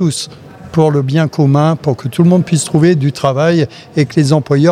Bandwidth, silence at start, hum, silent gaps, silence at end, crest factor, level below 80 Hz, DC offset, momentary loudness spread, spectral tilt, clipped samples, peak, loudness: 13 kHz; 0 s; none; none; 0 s; 12 dB; -50 dBFS; under 0.1%; 6 LU; -6.5 dB/octave; under 0.1%; 0 dBFS; -12 LUFS